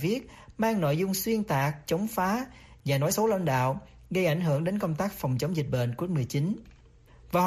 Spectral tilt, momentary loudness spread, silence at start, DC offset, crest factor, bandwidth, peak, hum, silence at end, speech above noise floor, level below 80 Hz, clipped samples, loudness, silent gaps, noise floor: -6 dB/octave; 7 LU; 0 s; under 0.1%; 14 dB; 15 kHz; -14 dBFS; none; 0 s; 27 dB; -56 dBFS; under 0.1%; -29 LUFS; none; -55 dBFS